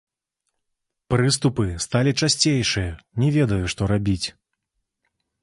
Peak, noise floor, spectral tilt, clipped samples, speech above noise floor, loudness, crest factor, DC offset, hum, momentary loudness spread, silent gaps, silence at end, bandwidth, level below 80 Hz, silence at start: -4 dBFS; -79 dBFS; -4.5 dB/octave; under 0.1%; 58 dB; -21 LUFS; 20 dB; under 0.1%; none; 7 LU; none; 1.1 s; 11.5 kHz; -42 dBFS; 1.1 s